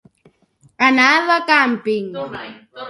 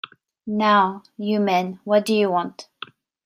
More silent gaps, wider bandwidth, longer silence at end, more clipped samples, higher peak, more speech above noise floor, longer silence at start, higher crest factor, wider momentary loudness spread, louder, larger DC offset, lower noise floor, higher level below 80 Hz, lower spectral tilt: neither; second, 11.5 kHz vs 15.5 kHz; second, 0 s vs 0.6 s; neither; first, 0 dBFS vs -6 dBFS; first, 39 dB vs 22 dB; first, 0.8 s vs 0.45 s; about the same, 18 dB vs 18 dB; second, 17 LU vs 21 LU; first, -14 LUFS vs -21 LUFS; neither; first, -56 dBFS vs -42 dBFS; first, -66 dBFS vs -72 dBFS; second, -3.5 dB/octave vs -5.5 dB/octave